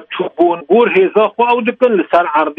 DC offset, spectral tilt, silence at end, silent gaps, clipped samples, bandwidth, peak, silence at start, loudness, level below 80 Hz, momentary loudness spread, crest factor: under 0.1%; -7.5 dB/octave; 0.05 s; none; under 0.1%; 5.2 kHz; 0 dBFS; 0 s; -12 LUFS; -60 dBFS; 4 LU; 12 dB